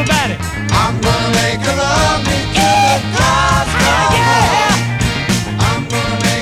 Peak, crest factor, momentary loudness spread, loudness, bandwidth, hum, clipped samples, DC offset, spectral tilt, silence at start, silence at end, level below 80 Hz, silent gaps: 0 dBFS; 12 dB; 5 LU; -13 LUFS; 16.5 kHz; none; under 0.1%; under 0.1%; -4 dB/octave; 0 s; 0 s; -26 dBFS; none